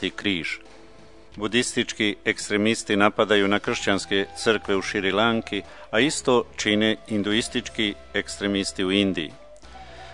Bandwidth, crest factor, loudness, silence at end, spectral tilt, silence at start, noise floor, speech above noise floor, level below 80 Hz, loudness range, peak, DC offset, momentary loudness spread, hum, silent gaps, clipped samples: 11 kHz; 24 dB; -23 LUFS; 0 s; -3.5 dB/octave; 0 s; -49 dBFS; 26 dB; -52 dBFS; 2 LU; 0 dBFS; 0.4%; 9 LU; none; none; under 0.1%